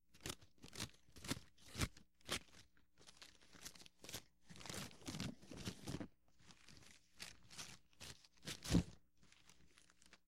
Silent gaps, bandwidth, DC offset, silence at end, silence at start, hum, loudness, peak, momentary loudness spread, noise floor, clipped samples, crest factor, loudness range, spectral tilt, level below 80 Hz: none; 16 kHz; under 0.1%; 0 s; 0 s; none; -49 LUFS; -24 dBFS; 21 LU; -72 dBFS; under 0.1%; 28 dB; 5 LU; -4 dB/octave; -62 dBFS